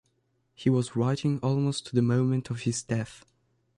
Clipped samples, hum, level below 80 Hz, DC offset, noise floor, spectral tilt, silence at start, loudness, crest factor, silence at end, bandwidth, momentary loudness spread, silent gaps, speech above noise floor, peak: under 0.1%; none; -62 dBFS; under 0.1%; -73 dBFS; -6.5 dB/octave; 0.6 s; -28 LUFS; 16 dB; 0.6 s; 11.5 kHz; 6 LU; none; 46 dB; -12 dBFS